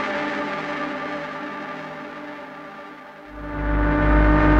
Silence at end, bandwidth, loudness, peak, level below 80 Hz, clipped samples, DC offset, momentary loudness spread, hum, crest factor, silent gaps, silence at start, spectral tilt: 0 s; 6.6 kHz; -24 LUFS; -6 dBFS; -26 dBFS; under 0.1%; under 0.1%; 19 LU; none; 16 dB; none; 0 s; -7.5 dB/octave